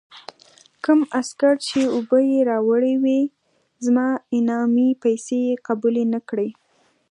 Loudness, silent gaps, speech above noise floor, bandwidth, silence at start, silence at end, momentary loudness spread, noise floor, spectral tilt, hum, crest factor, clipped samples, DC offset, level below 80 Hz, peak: -20 LUFS; none; 43 dB; 11 kHz; 0.15 s; 0.6 s; 8 LU; -62 dBFS; -5 dB/octave; none; 14 dB; under 0.1%; under 0.1%; -72 dBFS; -6 dBFS